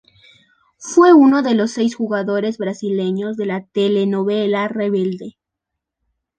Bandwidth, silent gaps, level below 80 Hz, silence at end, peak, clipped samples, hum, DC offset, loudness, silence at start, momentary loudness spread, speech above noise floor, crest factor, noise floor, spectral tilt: 9.4 kHz; none; -66 dBFS; 1.1 s; -2 dBFS; under 0.1%; none; under 0.1%; -17 LUFS; 0.8 s; 13 LU; 65 dB; 16 dB; -81 dBFS; -6 dB/octave